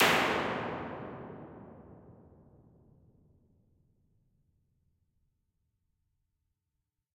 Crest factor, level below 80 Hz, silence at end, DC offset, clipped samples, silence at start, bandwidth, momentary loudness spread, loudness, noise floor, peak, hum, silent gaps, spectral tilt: 32 dB; -68 dBFS; 5 s; under 0.1%; under 0.1%; 0 s; 16 kHz; 26 LU; -32 LUFS; -86 dBFS; -6 dBFS; none; none; -3.5 dB/octave